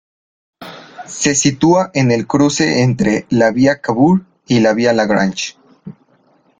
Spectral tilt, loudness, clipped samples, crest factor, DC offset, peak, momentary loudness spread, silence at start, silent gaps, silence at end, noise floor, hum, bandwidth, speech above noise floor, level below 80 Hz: -5 dB/octave; -14 LUFS; under 0.1%; 14 dB; under 0.1%; 0 dBFS; 13 LU; 0.6 s; none; 0.7 s; -54 dBFS; none; 9.6 kHz; 41 dB; -50 dBFS